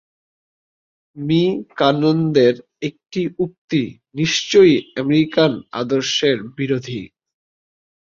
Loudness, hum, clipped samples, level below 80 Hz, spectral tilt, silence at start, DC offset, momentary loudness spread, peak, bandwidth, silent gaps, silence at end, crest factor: -18 LUFS; none; under 0.1%; -58 dBFS; -5.5 dB/octave; 1.15 s; under 0.1%; 12 LU; -2 dBFS; 7.6 kHz; 3.58-3.68 s; 1.1 s; 16 dB